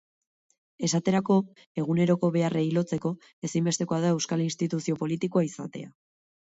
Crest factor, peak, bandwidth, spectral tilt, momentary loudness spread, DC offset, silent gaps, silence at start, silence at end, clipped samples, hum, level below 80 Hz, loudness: 16 dB; -10 dBFS; 8.2 kHz; -6 dB/octave; 11 LU; under 0.1%; 1.67-1.75 s, 3.33-3.42 s; 0.8 s; 0.6 s; under 0.1%; none; -68 dBFS; -27 LUFS